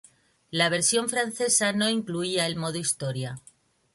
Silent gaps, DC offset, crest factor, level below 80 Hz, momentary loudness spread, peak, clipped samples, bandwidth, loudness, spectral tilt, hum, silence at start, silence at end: none; under 0.1%; 18 dB; -68 dBFS; 11 LU; -8 dBFS; under 0.1%; 12 kHz; -25 LUFS; -2.5 dB/octave; none; 0.5 s; 0.55 s